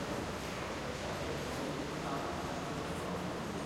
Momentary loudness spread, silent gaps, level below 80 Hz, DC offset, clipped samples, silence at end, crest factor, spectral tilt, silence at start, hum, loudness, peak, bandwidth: 1 LU; none; -54 dBFS; under 0.1%; under 0.1%; 0 s; 12 dB; -5 dB/octave; 0 s; none; -39 LUFS; -26 dBFS; 16 kHz